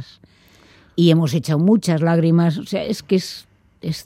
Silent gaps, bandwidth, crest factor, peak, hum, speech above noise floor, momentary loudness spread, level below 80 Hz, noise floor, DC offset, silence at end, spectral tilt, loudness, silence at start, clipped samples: none; 14.5 kHz; 16 dB; -2 dBFS; none; 34 dB; 14 LU; -58 dBFS; -51 dBFS; under 0.1%; 0.05 s; -7 dB/octave; -18 LUFS; 0 s; under 0.1%